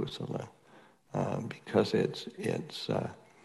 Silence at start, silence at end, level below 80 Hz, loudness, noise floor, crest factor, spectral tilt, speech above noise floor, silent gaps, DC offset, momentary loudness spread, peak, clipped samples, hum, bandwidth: 0 s; 0.25 s; -72 dBFS; -34 LUFS; -60 dBFS; 22 dB; -6.5 dB/octave; 27 dB; none; under 0.1%; 11 LU; -12 dBFS; under 0.1%; none; 12.5 kHz